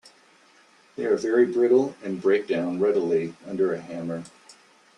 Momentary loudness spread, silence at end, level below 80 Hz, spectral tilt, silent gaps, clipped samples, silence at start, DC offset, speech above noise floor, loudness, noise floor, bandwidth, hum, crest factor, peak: 13 LU; 0.7 s; -70 dBFS; -6.5 dB/octave; none; under 0.1%; 1 s; under 0.1%; 34 dB; -24 LUFS; -57 dBFS; 10 kHz; none; 16 dB; -8 dBFS